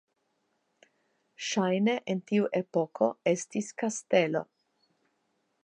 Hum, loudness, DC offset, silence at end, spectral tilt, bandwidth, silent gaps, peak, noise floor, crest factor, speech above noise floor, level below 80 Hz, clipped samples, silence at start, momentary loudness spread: none; -29 LUFS; under 0.1%; 1.2 s; -5 dB/octave; 9.8 kHz; none; -12 dBFS; -76 dBFS; 20 dB; 48 dB; -82 dBFS; under 0.1%; 1.4 s; 8 LU